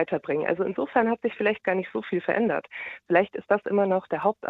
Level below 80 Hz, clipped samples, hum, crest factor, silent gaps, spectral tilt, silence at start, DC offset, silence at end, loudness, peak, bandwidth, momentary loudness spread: -68 dBFS; under 0.1%; none; 18 dB; none; -9 dB/octave; 0 s; under 0.1%; 0 s; -26 LUFS; -8 dBFS; 4.7 kHz; 5 LU